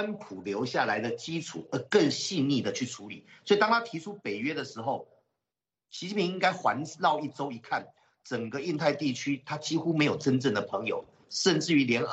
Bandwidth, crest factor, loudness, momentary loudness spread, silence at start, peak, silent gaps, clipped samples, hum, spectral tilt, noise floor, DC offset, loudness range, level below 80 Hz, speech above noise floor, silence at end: 8.4 kHz; 20 dB; -29 LUFS; 12 LU; 0 s; -10 dBFS; none; under 0.1%; none; -4.5 dB/octave; under -90 dBFS; under 0.1%; 3 LU; -74 dBFS; over 61 dB; 0 s